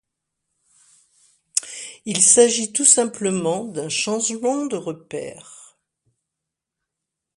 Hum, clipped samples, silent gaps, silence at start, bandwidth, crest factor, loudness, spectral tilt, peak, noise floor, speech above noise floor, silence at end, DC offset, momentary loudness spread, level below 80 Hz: none; under 0.1%; none; 1.55 s; 11.5 kHz; 22 dB; -18 LUFS; -2 dB/octave; 0 dBFS; -84 dBFS; 64 dB; 1.75 s; under 0.1%; 19 LU; -68 dBFS